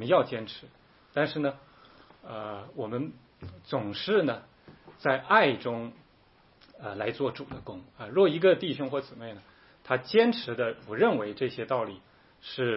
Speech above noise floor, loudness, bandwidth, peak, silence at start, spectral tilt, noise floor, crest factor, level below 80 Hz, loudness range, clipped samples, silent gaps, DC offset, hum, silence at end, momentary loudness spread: 33 dB; -28 LUFS; 5.8 kHz; -8 dBFS; 0 s; -9.5 dB/octave; -61 dBFS; 22 dB; -68 dBFS; 6 LU; under 0.1%; none; under 0.1%; none; 0 s; 20 LU